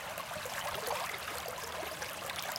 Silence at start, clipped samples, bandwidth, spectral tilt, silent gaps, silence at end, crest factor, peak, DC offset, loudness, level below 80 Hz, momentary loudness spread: 0 s; under 0.1%; 17 kHz; -1.5 dB/octave; none; 0 s; 18 dB; -20 dBFS; under 0.1%; -38 LUFS; -64 dBFS; 4 LU